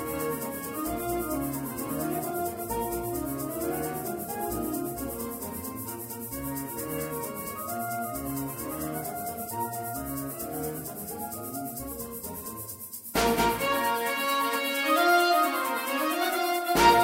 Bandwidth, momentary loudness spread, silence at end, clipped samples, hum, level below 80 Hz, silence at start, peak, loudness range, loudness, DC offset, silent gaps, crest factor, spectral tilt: 16.5 kHz; 11 LU; 0 s; under 0.1%; none; -50 dBFS; 0 s; -8 dBFS; 9 LU; -29 LUFS; under 0.1%; none; 22 dB; -3.5 dB/octave